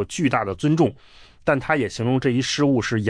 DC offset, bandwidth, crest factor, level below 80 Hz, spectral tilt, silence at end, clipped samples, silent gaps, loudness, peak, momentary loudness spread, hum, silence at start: under 0.1%; 10.5 kHz; 16 dB; -50 dBFS; -5.5 dB/octave; 0 s; under 0.1%; none; -21 LUFS; -6 dBFS; 3 LU; none; 0 s